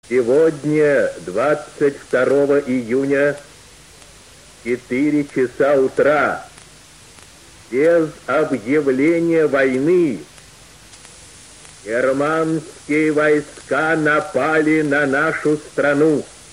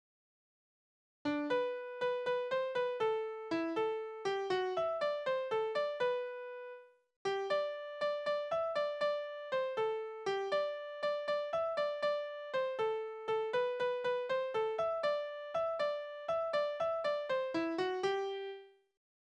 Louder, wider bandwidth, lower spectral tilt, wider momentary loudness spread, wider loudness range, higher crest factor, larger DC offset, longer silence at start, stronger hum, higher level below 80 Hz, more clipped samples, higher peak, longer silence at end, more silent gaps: first, -17 LUFS vs -36 LUFS; first, 14 kHz vs 9.8 kHz; first, -6 dB/octave vs -4.5 dB/octave; about the same, 7 LU vs 5 LU; about the same, 3 LU vs 2 LU; about the same, 14 dB vs 14 dB; first, 0.1% vs under 0.1%; second, 0.1 s vs 1.25 s; neither; first, -54 dBFS vs -78 dBFS; neither; first, -4 dBFS vs -22 dBFS; second, 0.25 s vs 0.6 s; second, none vs 7.16-7.25 s